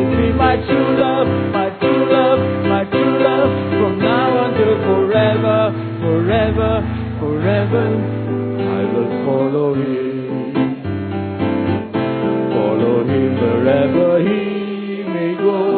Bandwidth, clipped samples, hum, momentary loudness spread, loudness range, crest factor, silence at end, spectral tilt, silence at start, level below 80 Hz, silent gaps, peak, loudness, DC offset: 4.5 kHz; under 0.1%; none; 7 LU; 4 LU; 14 dB; 0 s; -12.5 dB/octave; 0 s; -34 dBFS; none; -2 dBFS; -16 LUFS; under 0.1%